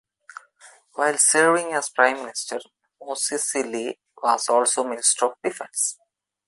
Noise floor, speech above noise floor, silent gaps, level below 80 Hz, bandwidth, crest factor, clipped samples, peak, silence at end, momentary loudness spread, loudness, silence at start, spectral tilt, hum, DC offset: -52 dBFS; 30 dB; none; -78 dBFS; 12 kHz; 20 dB; under 0.1%; -4 dBFS; 0.55 s; 13 LU; -21 LUFS; 0.65 s; -1 dB/octave; none; under 0.1%